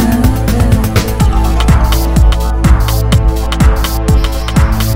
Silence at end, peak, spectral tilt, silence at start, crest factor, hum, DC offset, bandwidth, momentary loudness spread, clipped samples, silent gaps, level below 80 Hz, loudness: 0 s; 0 dBFS; -6 dB/octave; 0 s; 10 dB; none; under 0.1%; 16.5 kHz; 2 LU; 0.3%; none; -12 dBFS; -11 LUFS